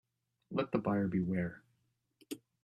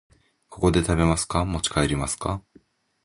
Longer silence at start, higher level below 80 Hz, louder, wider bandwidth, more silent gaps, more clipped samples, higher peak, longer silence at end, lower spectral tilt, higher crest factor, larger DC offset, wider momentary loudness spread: about the same, 0.5 s vs 0.5 s; second, -68 dBFS vs -36 dBFS; second, -36 LUFS vs -24 LUFS; first, 13.5 kHz vs 11.5 kHz; neither; neither; second, -18 dBFS vs -4 dBFS; second, 0.25 s vs 0.65 s; first, -8 dB/octave vs -5 dB/octave; about the same, 20 dB vs 20 dB; neither; first, 15 LU vs 8 LU